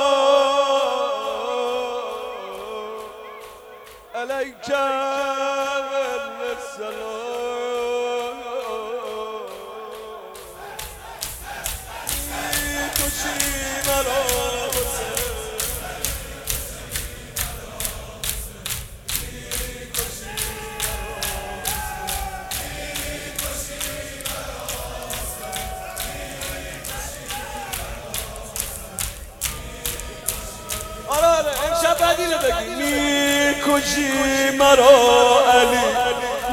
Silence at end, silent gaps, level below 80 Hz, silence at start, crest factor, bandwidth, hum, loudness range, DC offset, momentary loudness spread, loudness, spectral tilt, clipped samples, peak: 0 s; none; -38 dBFS; 0 s; 22 dB; 19 kHz; none; 11 LU; under 0.1%; 14 LU; -22 LUFS; -2.5 dB/octave; under 0.1%; 0 dBFS